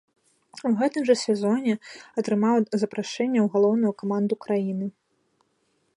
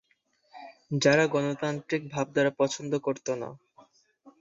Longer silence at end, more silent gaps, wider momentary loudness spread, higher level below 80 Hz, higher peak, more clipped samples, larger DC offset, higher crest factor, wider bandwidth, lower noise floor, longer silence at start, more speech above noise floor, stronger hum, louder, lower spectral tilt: first, 1.05 s vs 0.1 s; neither; second, 10 LU vs 18 LU; second, -76 dBFS vs -68 dBFS; about the same, -8 dBFS vs -8 dBFS; neither; neither; about the same, 18 dB vs 22 dB; first, 11 kHz vs 8 kHz; about the same, -70 dBFS vs -70 dBFS; about the same, 0.55 s vs 0.55 s; first, 47 dB vs 43 dB; neither; first, -24 LUFS vs -28 LUFS; about the same, -6 dB/octave vs -5 dB/octave